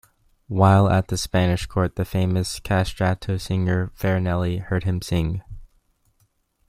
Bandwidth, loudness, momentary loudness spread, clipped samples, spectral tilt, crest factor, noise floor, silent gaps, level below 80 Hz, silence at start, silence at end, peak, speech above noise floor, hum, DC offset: 15 kHz; -22 LUFS; 8 LU; under 0.1%; -6.5 dB/octave; 18 dB; -66 dBFS; none; -42 dBFS; 0.5 s; 1.05 s; -4 dBFS; 45 dB; none; under 0.1%